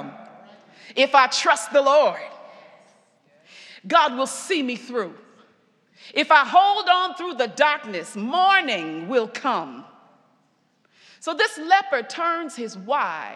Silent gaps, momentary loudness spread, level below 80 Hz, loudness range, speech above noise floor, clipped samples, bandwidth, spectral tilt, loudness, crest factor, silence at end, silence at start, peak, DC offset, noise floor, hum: none; 15 LU; under -90 dBFS; 6 LU; 44 dB; under 0.1%; 13 kHz; -2 dB/octave; -20 LUFS; 22 dB; 0 s; 0 s; 0 dBFS; under 0.1%; -65 dBFS; none